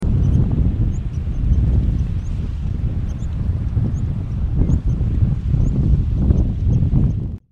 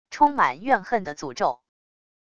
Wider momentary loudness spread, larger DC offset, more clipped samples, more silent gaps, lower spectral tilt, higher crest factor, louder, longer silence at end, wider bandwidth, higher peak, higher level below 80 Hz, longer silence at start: second, 7 LU vs 11 LU; neither; neither; neither; first, -10 dB/octave vs -4.5 dB/octave; second, 14 dB vs 20 dB; first, -20 LUFS vs -23 LUFS; second, 0.15 s vs 0.8 s; about the same, 7.2 kHz vs 7.6 kHz; first, -2 dBFS vs -6 dBFS; first, -20 dBFS vs -62 dBFS; about the same, 0 s vs 0.1 s